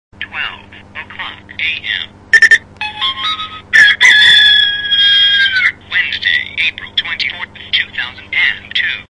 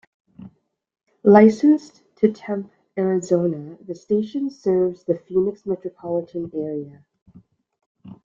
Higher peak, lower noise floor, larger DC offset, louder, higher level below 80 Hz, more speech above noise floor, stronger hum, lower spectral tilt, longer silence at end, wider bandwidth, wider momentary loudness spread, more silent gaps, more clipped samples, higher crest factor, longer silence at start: about the same, 0 dBFS vs -2 dBFS; second, -32 dBFS vs -52 dBFS; neither; first, -10 LUFS vs -20 LUFS; first, -50 dBFS vs -64 dBFS; second, 14 dB vs 32 dB; first, 50 Hz at -45 dBFS vs none; second, 0.5 dB/octave vs -8 dB/octave; about the same, 0.1 s vs 0.1 s; first, 12 kHz vs 7.4 kHz; first, 19 LU vs 16 LU; second, none vs 7.22-7.26 s, 7.86-7.95 s; first, 0.3% vs under 0.1%; second, 14 dB vs 20 dB; second, 0.2 s vs 0.4 s